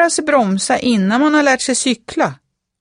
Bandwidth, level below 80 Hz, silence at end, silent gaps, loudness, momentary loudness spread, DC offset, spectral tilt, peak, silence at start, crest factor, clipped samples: 11 kHz; -54 dBFS; 0.45 s; none; -15 LUFS; 7 LU; under 0.1%; -3.5 dB/octave; -2 dBFS; 0 s; 14 dB; under 0.1%